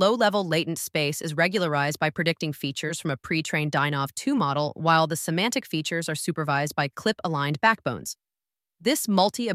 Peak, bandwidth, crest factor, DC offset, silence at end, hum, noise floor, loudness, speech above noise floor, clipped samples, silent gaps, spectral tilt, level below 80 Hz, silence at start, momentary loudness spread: -6 dBFS; 16 kHz; 20 dB; under 0.1%; 0 s; none; under -90 dBFS; -25 LUFS; over 65 dB; under 0.1%; none; -4.5 dB/octave; -66 dBFS; 0 s; 7 LU